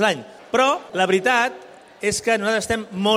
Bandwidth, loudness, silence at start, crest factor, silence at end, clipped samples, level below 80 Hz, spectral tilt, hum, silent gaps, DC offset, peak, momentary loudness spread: 16 kHz; -21 LUFS; 0 s; 16 dB; 0 s; under 0.1%; -54 dBFS; -3 dB/octave; none; none; under 0.1%; -4 dBFS; 8 LU